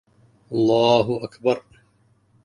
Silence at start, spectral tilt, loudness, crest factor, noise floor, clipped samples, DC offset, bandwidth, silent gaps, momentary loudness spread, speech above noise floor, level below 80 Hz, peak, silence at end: 0.5 s; -6.5 dB/octave; -21 LUFS; 18 dB; -61 dBFS; under 0.1%; under 0.1%; 10.5 kHz; none; 11 LU; 42 dB; -60 dBFS; -4 dBFS; 0.85 s